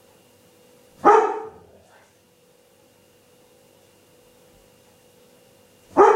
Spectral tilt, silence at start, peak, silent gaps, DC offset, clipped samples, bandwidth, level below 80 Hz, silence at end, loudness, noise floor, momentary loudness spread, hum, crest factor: -5 dB/octave; 1.05 s; -2 dBFS; none; under 0.1%; under 0.1%; 14 kHz; -66 dBFS; 0 s; -19 LUFS; -57 dBFS; 18 LU; none; 22 dB